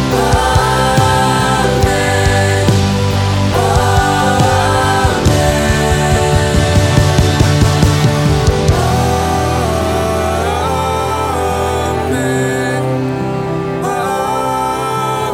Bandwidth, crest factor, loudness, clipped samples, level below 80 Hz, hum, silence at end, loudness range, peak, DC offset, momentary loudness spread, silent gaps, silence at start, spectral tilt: 17 kHz; 12 dB; -13 LUFS; under 0.1%; -24 dBFS; none; 0 s; 4 LU; 0 dBFS; under 0.1%; 5 LU; none; 0 s; -5 dB/octave